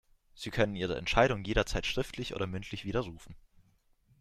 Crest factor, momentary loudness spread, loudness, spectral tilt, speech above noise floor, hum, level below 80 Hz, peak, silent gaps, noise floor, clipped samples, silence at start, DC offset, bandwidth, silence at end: 24 dB; 12 LU; -32 LUFS; -5 dB/octave; 36 dB; none; -44 dBFS; -10 dBFS; none; -68 dBFS; under 0.1%; 0.35 s; under 0.1%; 14.5 kHz; 0.85 s